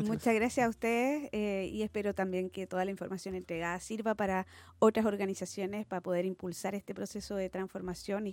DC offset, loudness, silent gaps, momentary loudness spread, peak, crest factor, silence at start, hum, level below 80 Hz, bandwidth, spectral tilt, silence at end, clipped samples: under 0.1%; -34 LUFS; none; 10 LU; -14 dBFS; 20 dB; 0 s; none; -62 dBFS; 17 kHz; -5.5 dB/octave; 0 s; under 0.1%